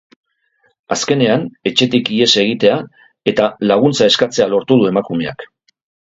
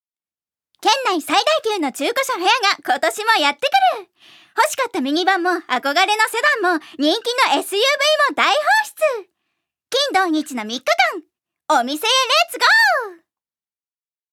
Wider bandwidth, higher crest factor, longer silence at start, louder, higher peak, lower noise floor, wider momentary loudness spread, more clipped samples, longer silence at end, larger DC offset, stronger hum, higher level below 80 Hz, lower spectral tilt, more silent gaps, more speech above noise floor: second, 8 kHz vs 18.5 kHz; about the same, 16 dB vs 18 dB; about the same, 0.9 s vs 0.8 s; first, -14 LUFS vs -17 LUFS; about the same, 0 dBFS vs 0 dBFS; second, -61 dBFS vs under -90 dBFS; first, 10 LU vs 7 LU; neither; second, 0.6 s vs 1.2 s; neither; neither; first, -54 dBFS vs -80 dBFS; first, -4.5 dB/octave vs 0 dB/octave; neither; second, 47 dB vs over 72 dB